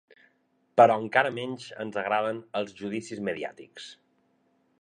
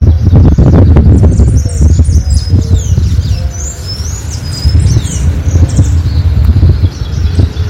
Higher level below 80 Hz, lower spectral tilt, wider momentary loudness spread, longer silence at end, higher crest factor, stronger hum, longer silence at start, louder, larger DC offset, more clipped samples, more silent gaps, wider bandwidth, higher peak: second, -74 dBFS vs -12 dBFS; second, -5 dB/octave vs -7 dB/octave; first, 21 LU vs 12 LU; first, 0.85 s vs 0 s; first, 24 dB vs 6 dB; neither; first, 0.75 s vs 0 s; second, -27 LUFS vs -9 LUFS; neither; second, under 0.1% vs 9%; neither; about the same, 10 kHz vs 10.5 kHz; second, -6 dBFS vs 0 dBFS